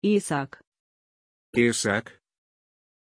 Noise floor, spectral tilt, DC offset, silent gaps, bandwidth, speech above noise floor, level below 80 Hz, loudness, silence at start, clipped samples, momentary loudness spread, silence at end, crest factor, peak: under -90 dBFS; -4.5 dB/octave; under 0.1%; 0.67-0.72 s, 0.79-1.53 s; 11 kHz; over 66 dB; -64 dBFS; -25 LUFS; 0 s; under 0.1%; 8 LU; 1 s; 20 dB; -8 dBFS